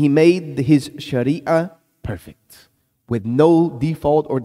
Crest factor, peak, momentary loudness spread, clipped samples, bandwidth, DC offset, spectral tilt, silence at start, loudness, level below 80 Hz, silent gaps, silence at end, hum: 16 dB; -2 dBFS; 17 LU; under 0.1%; 14 kHz; under 0.1%; -7.5 dB/octave; 0 s; -17 LUFS; -48 dBFS; none; 0 s; none